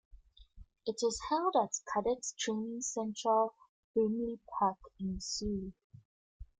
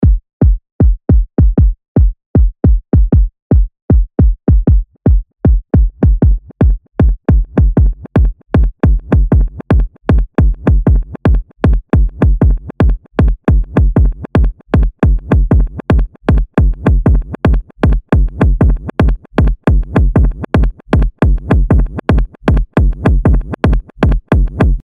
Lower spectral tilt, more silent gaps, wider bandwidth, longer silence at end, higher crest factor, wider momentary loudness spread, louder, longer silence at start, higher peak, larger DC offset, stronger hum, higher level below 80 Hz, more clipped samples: second, -4 dB/octave vs -10 dB/octave; first, 3.69-3.94 s, 5.84-5.90 s, 6.05-6.40 s vs 0.33-0.40 s, 0.72-0.79 s, 1.88-1.95 s, 2.26-2.34 s, 3.42-3.50 s, 3.82-3.88 s; first, 9.6 kHz vs 4.5 kHz; first, 0.15 s vs 0 s; first, 20 dB vs 10 dB; first, 10 LU vs 3 LU; second, -35 LUFS vs -13 LUFS; first, 0.15 s vs 0 s; second, -16 dBFS vs 0 dBFS; neither; neither; second, -58 dBFS vs -12 dBFS; neither